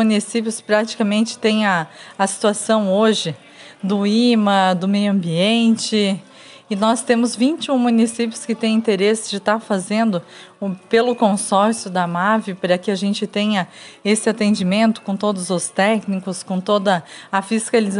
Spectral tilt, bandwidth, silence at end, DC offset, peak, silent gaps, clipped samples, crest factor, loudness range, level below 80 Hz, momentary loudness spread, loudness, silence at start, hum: -4.5 dB/octave; 11.5 kHz; 0 s; under 0.1%; -2 dBFS; none; under 0.1%; 16 dB; 2 LU; -72 dBFS; 8 LU; -18 LUFS; 0 s; none